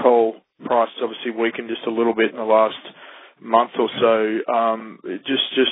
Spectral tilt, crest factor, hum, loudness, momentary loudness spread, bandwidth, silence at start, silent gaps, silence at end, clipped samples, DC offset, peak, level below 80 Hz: -8 dB/octave; 20 dB; none; -20 LUFS; 12 LU; 4 kHz; 0 s; none; 0 s; under 0.1%; under 0.1%; -2 dBFS; -70 dBFS